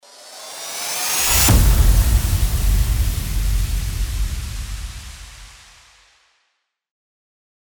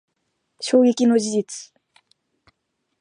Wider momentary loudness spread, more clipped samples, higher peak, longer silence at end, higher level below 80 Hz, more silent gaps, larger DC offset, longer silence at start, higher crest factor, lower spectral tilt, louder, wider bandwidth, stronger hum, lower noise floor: first, 22 LU vs 17 LU; neither; about the same, -2 dBFS vs -4 dBFS; first, 2.15 s vs 1.35 s; first, -22 dBFS vs -76 dBFS; neither; neither; second, 0.2 s vs 0.6 s; about the same, 18 dB vs 18 dB; about the same, -3.5 dB/octave vs -4.5 dB/octave; about the same, -19 LUFS vs -19 LUFS; first, over 20 kHz vs 10.5 kHz; neither; second, -71 dBFS vs -75 dBFS